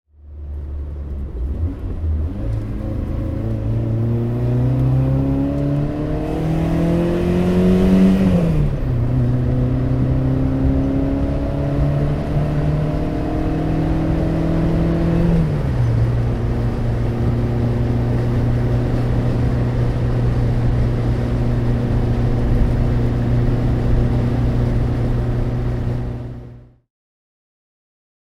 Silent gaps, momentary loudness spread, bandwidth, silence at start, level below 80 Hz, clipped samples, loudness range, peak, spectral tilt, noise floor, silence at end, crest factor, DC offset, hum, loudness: none; 7 LU; 6.8 kHz; 0.25 s; -24 dBFS; under 0.1%; 6 LU; -4 dBFS; -9.5 dB/octave; -39 dBFS; 1.65 s; 14 dB; under 0.1%; none; -19 LUFS